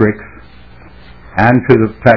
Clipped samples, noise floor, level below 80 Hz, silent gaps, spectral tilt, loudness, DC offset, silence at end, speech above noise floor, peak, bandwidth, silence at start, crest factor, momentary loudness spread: 1%; -38 dBFS; -38 dBFS; none; -9.5 dB/octave; -11 LUFS; 1%; 0 s; 29 dB; 0 dBFS; 5.4 kHz; 0 s; 12 dB; 13 LU